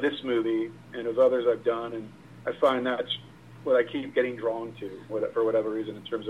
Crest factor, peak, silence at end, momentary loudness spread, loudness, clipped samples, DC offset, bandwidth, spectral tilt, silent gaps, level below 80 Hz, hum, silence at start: 18 dB; -10 dBFS; 0 s; 13 LU; -28 LUFS; under 0.1%; under 0.1%; 10.5 kHz; -6.5 dB/octave; none; -68 dBFS; none; 0 s